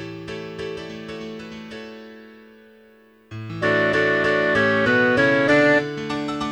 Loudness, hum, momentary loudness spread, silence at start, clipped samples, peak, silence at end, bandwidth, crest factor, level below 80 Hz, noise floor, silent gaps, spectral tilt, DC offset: -19 LUFS; none; 20 LU; 0 s; under 0.1%; -6 dBFS; 0 s; 10.5 kHz; 16 dB; -54 dBFS; -52 dBFS; none; -5.5 dB/octave; under 0.1%